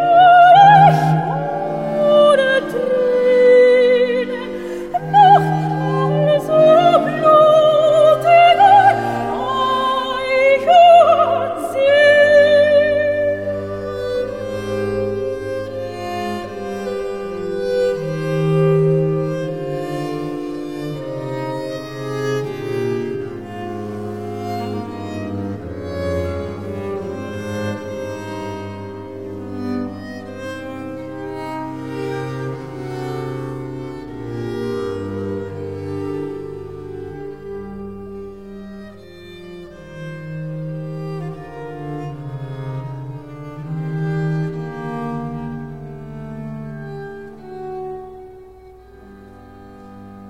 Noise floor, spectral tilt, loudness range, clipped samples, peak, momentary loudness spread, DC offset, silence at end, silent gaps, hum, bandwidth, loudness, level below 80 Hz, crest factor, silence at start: -42 dBFS; -6.5 dB/octave; 18 LU; under 0.1%; 0 dBFS; 21 LU; 0.4%; 0 s; none; none; 15 kHz; -16 LUFS; -50 dBFS; 16 dB; 0 s